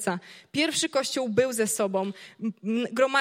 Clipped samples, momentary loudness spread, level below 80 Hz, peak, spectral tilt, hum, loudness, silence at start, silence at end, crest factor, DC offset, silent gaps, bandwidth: under 0.1%; 10 LU; -70 dBFS; -8 dBFS; -3 dB/octave; none; -27 LUFS; 0 s; 0 s; 18 dB; under 0.1%; none; 16.5 kHz